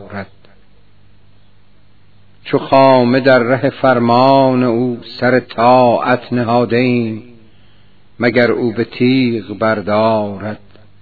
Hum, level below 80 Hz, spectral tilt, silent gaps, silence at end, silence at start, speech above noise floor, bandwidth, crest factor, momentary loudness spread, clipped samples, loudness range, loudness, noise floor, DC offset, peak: 50 Hz at -50 dBFS; -54 dBFS; -9 dB/octave; none; 0.45 s; 0 s; 39 dB; 5.4 kHz; 14 dB; 13 LU; 0.1%; 4 LU; -13 LUFS; -51 dBFS; 0.9%; 0 dBFS